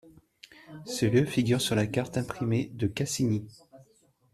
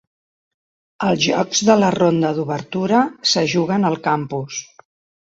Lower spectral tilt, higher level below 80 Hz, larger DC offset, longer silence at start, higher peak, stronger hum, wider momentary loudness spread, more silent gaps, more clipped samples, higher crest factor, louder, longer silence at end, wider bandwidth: about the same, -5.5 dB/octave vs -4.5 dB/octave; about the same, -60 dBFS vs -58 dBFS; neither; second, 0.05 s vs 1 s; second, -12 dBFS vs -2 dBFS; neither; first, 12 LU vs 9 LU; neither; neither; about the same, 18 dB vs 18 dB; second, -28 LUFS vs -18 LUFS; second, 0.5 s vs 0.7 s; first, 14 kHz vs 8 kHz